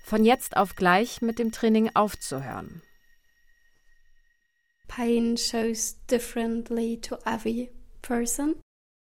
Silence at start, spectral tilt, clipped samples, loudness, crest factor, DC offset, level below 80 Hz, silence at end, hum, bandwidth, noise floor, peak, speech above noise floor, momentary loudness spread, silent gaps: 0.05 s; -4 dB/octave; under 0.1%; -26 LUFS; 20 dB; under 0.1%; -50 dBFS; 0.45 s; none; 17 kHz; -73 dBFS; -8 dBFS; 47 dB; 13 LU; none